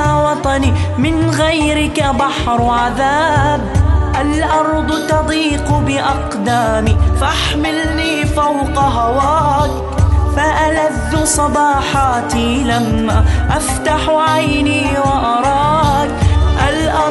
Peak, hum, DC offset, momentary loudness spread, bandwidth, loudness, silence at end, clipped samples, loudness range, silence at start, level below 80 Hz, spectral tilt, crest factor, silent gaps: 0 dBFS; none; under 0.1%; 3 LU; 12 kHz; -14 LUFS; 0 s; under 0.1%; 1 LU; 0 s; -20 dBFS; -5 dB/octave; 12 dB; none